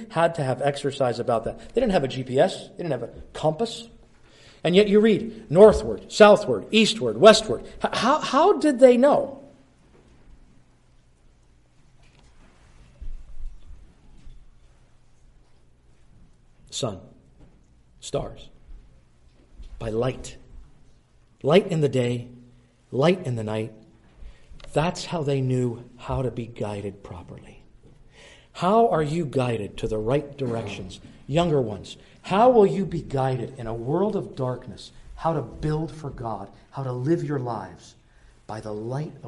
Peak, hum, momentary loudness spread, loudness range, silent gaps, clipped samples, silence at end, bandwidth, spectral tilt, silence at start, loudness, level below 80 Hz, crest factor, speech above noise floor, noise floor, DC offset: 0 dBFS; none; 21 LU; 18 LU; none; under 0.1%; 0 s; 11.5 kHz; -6 dB/octave; 0 s; -23 LUFS; -46 dBFS; 24 dB; 34 dB; -57 dBFS; under 0.1%